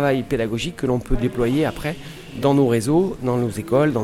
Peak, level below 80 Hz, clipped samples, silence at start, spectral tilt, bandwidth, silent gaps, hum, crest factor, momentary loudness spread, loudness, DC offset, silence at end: -6 dBFS; -34 dBFS; under 0.1%; 0 s; -6.5 dB/octave; 16 kHz; none; none; 14 dB; 8 LU; -21 LUFS; under 0.1%; 0 s